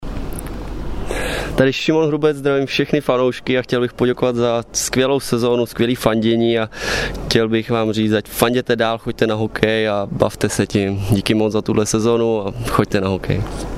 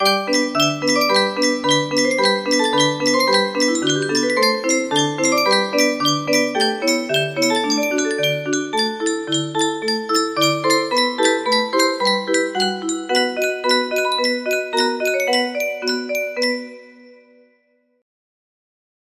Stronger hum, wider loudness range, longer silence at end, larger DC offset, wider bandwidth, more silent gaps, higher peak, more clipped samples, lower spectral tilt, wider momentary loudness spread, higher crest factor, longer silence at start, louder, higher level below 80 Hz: neither; second, 1 LU vs 4 LU; second, 0 s vs 1.9 s; neither; about the same, 16 kHz vs 15 kHz; neither; about the same, 0 dBFS vs -2 dBFS; neither; first, -5 dB/octave vs -2.5 dB/octave; about the same, 6 LU vs 5 LU; about the same, 18 dB vs 18 dB; about the same, 0 s vs 0 s; about the same, -18 LUFS vs -18 LUFS; first, -34 dBFS vs -66 dBFS